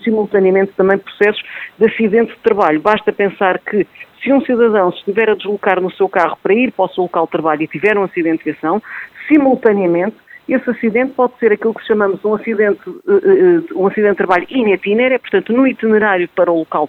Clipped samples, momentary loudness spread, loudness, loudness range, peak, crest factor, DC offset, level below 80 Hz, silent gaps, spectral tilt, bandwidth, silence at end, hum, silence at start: under 0.1%; 6 LU; -14 LUFS; 2 LU; 0 dBFS; 14 dB; under 0.1%; -58 dBFS; none; -8 dB/octave; 5 kHz; 0 s; none; 0 s